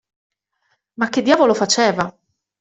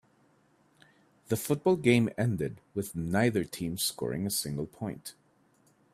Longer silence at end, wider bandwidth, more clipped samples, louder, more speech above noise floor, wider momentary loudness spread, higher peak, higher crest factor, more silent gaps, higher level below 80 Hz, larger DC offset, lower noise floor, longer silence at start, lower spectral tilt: second, 0.5 s vs 0.85 s; second, 8.2 kHz vs 16 kHz; neither; first, -17 LUFS vs -30 LUFS; first, 52 dB vs 37 dB; about the same, 10 LU vs 12 LU; first, -2 dBFS vs -10 dBFS; about the same, 18 dB vs 22 dB; neither; about the same, -60 dBFS vs -62 dBFS; neither; about the same, -68 dBFS vs -67 dBFS; second, 1 s vs 1.3 s; second, -3.5 dB/octave vs -5 dB/octave